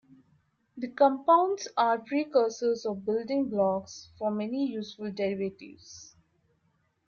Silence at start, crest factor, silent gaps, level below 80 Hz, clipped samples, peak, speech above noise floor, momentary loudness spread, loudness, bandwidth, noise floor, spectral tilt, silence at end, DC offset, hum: 0.75 s; 18 dB; none; -74 dBFS; under 0.1%; -10 dBFS; 44 dB; 20 LU; -28 LUFS; 7.2 kHz; -72 dBFS; -5.5 dB/octave; 1 s; under 0.1%; none